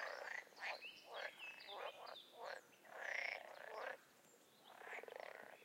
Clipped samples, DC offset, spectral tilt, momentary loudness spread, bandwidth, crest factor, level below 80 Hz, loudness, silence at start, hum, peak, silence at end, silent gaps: under 0.1%; under 0.1%; -0.5 dB/octave; 13 LU; 16 kHz; 22 dB; under -90 dBFS; -51 LUFS; 0 s; none; -30 dBFS; 0 s; none